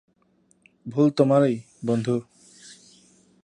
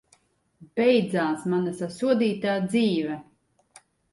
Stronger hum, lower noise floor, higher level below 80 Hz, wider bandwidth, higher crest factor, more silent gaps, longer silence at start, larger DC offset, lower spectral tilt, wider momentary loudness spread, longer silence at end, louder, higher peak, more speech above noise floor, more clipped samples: neither; about the same, -64 dBFS vs -64 dBFS; about the same, -70 dBFS vs -68 dBFS; about the same, 10.5 kHz vs 11.5 kHz; about the same, 20 dB vs 18 dB; neither; first, 0.85 s vs 0.6 s; neither; about the same, -7.5 dB/octave vs -6.5 dB/octave; about the same, 12 LU vs 10 LU; second, 0.7 s vs 0.9 s; about the same, -23 LUFS vs -25 LUFS; first, -4 dBFS vs -8 dBFS; about the same, 43 dB vs 40 dB; neither